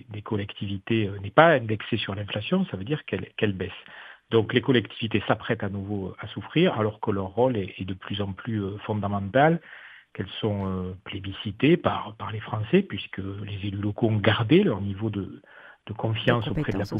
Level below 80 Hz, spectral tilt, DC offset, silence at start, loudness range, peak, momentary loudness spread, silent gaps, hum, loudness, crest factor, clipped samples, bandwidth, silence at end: -56 dBFS; -8.5 dB/octave; under 0.1%; 0.1 s; 3 LU; -2 dBFS; 14 LU; none; none; -26 LUFS; 24 dB; under 0.1%; 6 kHz; 0 s